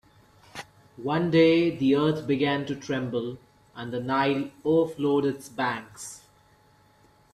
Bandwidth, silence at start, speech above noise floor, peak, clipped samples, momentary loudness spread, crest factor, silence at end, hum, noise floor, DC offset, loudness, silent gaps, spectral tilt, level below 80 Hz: 13.5 kHz; 0.55 s; 35 dB; -8 dBFS; under 0.1%; 22 LU; 18 dB; 1.15 s; none; -60 dBFS; under 0.1%; -25 LUFS; none; -6 dB/octave; -64 dBFS